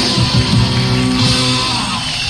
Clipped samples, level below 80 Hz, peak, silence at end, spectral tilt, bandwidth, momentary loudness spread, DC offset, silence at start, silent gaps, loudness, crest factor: under 0.1%; -28 dBFS; 0 dBFS; 0 s; -4 dB/octave; 13 kHz; 3 LU; under 0.1%; 0 s; none; -13 LUFS; 14 dB